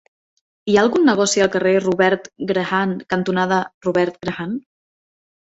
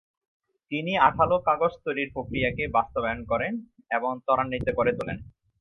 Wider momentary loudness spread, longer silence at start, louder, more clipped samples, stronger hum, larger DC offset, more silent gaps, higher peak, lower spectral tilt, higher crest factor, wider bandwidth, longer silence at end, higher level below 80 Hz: about the same, 11 LU vs 10 LU; about the same, 0.65 s vs 0.7 s; first, -18 LUFS vs -26 LUFS; neither; neither; neither; first, 3.74-3.81 s vs none; about the same, -2 dBFS vs -4 dBFS; second, -4.5 dB/octave vs -7.5 dB/octave; second, 16 dB vs 22 dB; first, 8.2 kHz vs 6.2 kHz; first, 0.9 s vs 0.35 s; second, -58 dBFS vs -48 dBFS